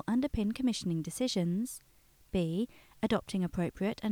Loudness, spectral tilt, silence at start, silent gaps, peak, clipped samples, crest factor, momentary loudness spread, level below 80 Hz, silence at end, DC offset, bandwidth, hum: -34 LUFS; -6 dB/octave; 0.05 s; none; -16 dBFS; under 0.1%; 16 dB; 6 LU; -54 dBFS; 0 s; under 0.1%; 19.5 kHz; none